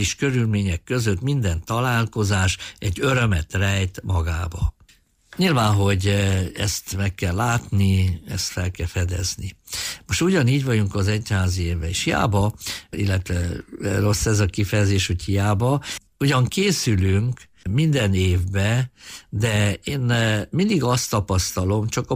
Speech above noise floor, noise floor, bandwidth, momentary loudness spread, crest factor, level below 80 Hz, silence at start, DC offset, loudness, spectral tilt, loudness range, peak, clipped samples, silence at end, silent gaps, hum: 35 dB; -56 dBFS; 15.5 kHz; 7 LU; 12 dB; -38 dBFS; 0 s; under 0.1%; -22 LUFS; -5 dB/octave; 2 LU; -8 dBFS; under 0.1%; 0 s; none; none